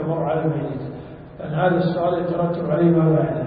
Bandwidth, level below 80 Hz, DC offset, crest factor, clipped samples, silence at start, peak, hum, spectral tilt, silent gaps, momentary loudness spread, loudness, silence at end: 4.9 kHz; -50 dBFS; under 0.1%; 14 dB; under 0.1%; 0 s; -6 dBFS; none; -13 dB/octave; none; 17 LU; -21 LUFS; 0 s